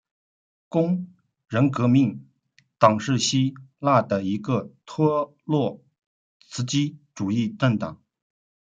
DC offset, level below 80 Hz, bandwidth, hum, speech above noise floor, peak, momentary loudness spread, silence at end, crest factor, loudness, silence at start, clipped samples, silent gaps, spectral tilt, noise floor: under 0.1%; -66 dBFS; 9.2 kHz; none; 42 dB; -2 dBFS; 11 LU; 0.8 s; 22 dB; -23 LUFS; 0.7 s; under 0.1%; 6.06-6.40 s; -6 dB/octave; -64 dBFS